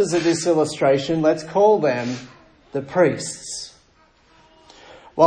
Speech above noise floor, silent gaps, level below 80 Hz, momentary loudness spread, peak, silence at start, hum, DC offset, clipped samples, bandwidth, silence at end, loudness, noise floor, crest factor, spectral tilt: 37 dB; none; -58 dBFS; 15 LU; 0 dBFS; 0 s; none; under 0.1%; under 0.1%; 10 kHz; 0 s; -20 LUFS; -56 dBFS; 20 dB; -5 dB/octave